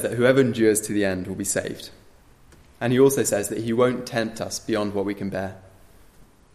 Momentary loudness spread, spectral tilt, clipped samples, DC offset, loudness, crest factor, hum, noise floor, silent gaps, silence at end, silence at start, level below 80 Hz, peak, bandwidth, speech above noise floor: 12 LU; -4.5 dB/octave; under 0.1%; under 0.1%; -23 LUFS; 18 dB; none; -52 dBFS; none; 0.35 s; 0 s; -56 dBFS; -4 dBFS; 15.5 kHz; 30 dB